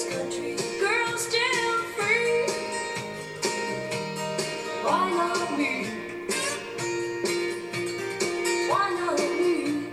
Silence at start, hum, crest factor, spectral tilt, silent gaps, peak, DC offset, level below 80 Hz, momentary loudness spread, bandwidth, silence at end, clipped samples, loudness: 0 s; none; 16 dB; -3 dB/octave; none; -10 dBFS; under 0.1%; -64 dBFS; 7 LU; 15.5 kHz; 0 s; under 0.1%; -27 LUFS